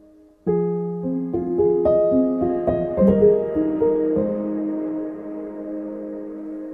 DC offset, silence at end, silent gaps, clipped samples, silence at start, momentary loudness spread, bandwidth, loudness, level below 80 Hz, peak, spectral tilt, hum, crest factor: under 0.1%; 0 s; none; under 0.1%; 0.45 s; 14 LU; 3.8 kHz; -21 LUFS; -46 dBFS; -4 dBFS; -12 dB/octave; none; 18 dB